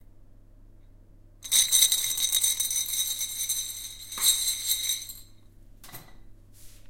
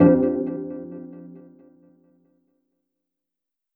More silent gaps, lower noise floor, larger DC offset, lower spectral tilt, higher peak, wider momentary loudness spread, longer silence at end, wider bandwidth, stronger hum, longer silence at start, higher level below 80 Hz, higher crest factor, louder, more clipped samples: neither; second, -52 dBFS vs -86 dBFS; neither; second, 2.5 dB/octave vs -13.5 dB/octave; second, -6 dBFS vs -2 dBFS; second, 21 LU vs 25 LU; second, 0 s vs 2.35 s; first, 17 kHz vs 2.8 kHz; neither; first, 0.15 s vs 0 s; about the same, -54 dBFS vs -58 dBFS; about the same, 24 dB vs 22 dB; about the same, -24 LUFS vs -23 LUFS; neither